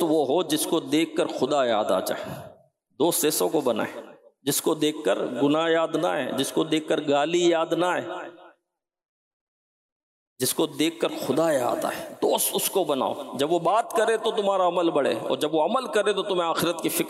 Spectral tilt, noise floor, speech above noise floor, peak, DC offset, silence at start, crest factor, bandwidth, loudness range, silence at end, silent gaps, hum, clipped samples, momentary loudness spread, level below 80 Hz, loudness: -3.5 dB/octave; -81 dBFS; 57 dB; -12 dBFS; under 0.1%; 0 s; 12 dB; 16 kHz; 5 LU; 0 s; 9.05-10.36 s; none; under 0.1%; 6 LU; -74 dBFS; -24 LUFS